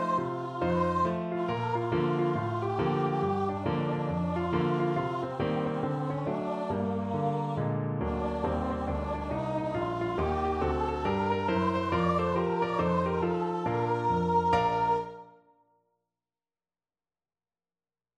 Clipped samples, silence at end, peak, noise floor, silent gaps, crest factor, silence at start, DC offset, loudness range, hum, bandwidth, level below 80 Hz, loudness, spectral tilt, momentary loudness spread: under 0.1%; 2.9 s; -12 dBFS; under -90 dBFS; none; 16 dB; 0 s; under 0.1%; 3 LU; none; 9.2 kHz; -48 dBFS; -30 LUFS; -8 dB/octave; 5 LU